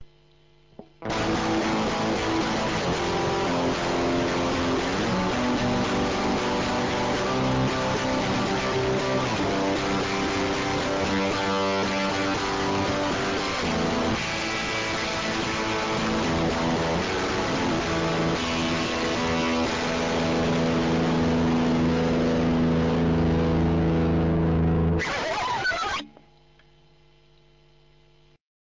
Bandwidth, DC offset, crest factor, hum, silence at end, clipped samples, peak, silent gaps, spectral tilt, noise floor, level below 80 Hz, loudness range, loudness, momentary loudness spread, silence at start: 7.6 kHz; under 0.1%; 10 dB; none; 2.7 s; under 0.1%; -16 dBFS; none; -5 dB/octave; -59 dBFS; -40 dBFS; 3 LU; -25 LUFS; 3 LU; 0 s